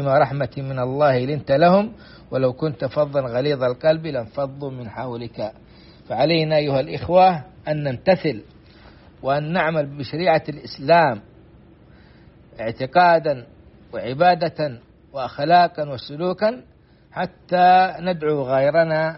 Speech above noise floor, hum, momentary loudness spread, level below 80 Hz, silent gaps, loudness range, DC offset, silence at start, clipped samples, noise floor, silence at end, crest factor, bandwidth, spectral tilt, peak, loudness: 29 dB; none; 15 LU; -52 dBFS; none; 3 LU; under 0.1%; 0 s; under 0.1%; -48 dBFS; 0 s; 18 dB; 6 kHz; -4.5 dB/octave; -4 dBFS; -20 LUFS